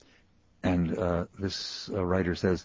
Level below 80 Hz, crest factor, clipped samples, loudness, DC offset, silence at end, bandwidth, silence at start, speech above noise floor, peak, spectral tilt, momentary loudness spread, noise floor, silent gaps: -44 dBFS; 18 dB; under 0.1%; -30 LUFS; under 0.1%; 0 s; 7.6 kHz; 0.65 s; 34 dB; -12 dBFS; -6 dB/octave; 6 LU; -64 dBFS; none